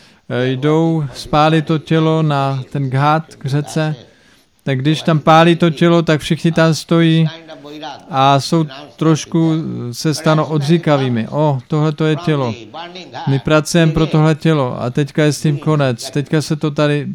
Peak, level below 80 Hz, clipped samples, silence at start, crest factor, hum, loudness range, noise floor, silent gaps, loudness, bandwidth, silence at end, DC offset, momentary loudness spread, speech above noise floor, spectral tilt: 0 dBFS; -44 dBFS; under 0.1%; 0.3 s; 14 dB; none; 3 LU; -51 dBFS; none; -15 LUFS; 13 kHz; 0 s; under 0.1%; 10 LU; 37 dB; -6.5 dB/octave